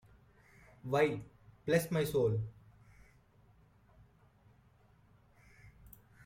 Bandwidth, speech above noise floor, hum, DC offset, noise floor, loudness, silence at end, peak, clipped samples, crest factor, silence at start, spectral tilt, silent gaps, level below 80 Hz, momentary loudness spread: 16.5 kHz; 34 dB; none; under 0.1%; -66 dBFS; -34 LUFS; 0.55 s; -16 dBFS; under 0.1%; 22 dB; 0.85 s; -6 dB/octave; none; -64 dBFS; 26 LU